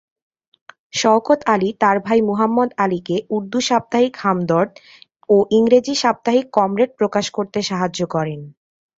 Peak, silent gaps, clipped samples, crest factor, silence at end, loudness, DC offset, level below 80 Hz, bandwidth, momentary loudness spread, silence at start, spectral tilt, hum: -2 dBFS; none; under 0.1%; 18 dB; 0.5 s; -18 LUFS; under 0.1%; -60 dBFS; 7.8 kHz; 7 LU; 0.95 s; -5 dB/octave; none